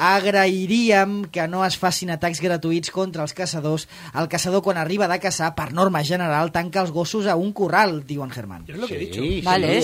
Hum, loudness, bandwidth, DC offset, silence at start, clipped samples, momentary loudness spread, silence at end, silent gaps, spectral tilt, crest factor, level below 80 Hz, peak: none; -21 LUFS; 16 kHz; under 0.1%; 0 s; under 0.1%; 11 LU; 0 s; none; -4.5 dB/octave; 18 dB; -48 dBFS; -4 dBFS